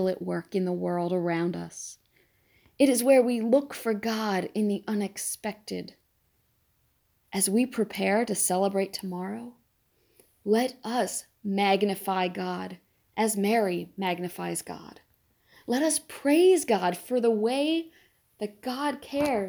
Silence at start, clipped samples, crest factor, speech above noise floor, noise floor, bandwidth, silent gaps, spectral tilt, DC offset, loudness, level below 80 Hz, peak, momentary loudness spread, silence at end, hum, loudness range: 0 s; under 0.1%; 18 dB; 44 dB; -70 dBFS; over 20 kHz; none; -4.5 dB/octave; under 0.1%; -27 LUFS; -70 dBFS; -10 dBFS; 15 LU; 0 s; none; 5 LU